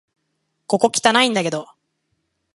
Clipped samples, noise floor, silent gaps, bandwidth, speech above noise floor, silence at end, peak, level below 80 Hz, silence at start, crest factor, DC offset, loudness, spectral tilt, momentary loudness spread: under 0.1%; -72 dBFS; none; 11.5 kHz; 55 dB; 0.9 s; 0 dBFS; -68 dBFS; 0.7 s; 22 dB; under 0.1%; -17 LUFS; -3 dB/octave; 10 LU